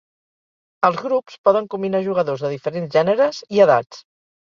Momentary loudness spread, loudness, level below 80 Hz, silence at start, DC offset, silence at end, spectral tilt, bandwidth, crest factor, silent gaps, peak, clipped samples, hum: 9 LU; -19 LUFS; -66 dBFS; 0.8 s; under 0.1%; 0.5 s; -6.5 dB/octave; 7.4 kHz; 20 dB; 1.38-1.44 s; 0 dBFS; under 0.1%; none